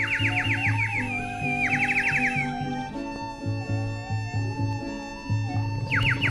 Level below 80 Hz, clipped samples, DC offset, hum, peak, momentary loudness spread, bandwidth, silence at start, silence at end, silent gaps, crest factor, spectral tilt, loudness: -46 dBFS; under 0.1%; under 0.1%; none; -12 dBFS; 11 LU; 11.5 kHz; 0 s; 0 s; none; 14 dB; -5.5 dB/octave; -26 LUFS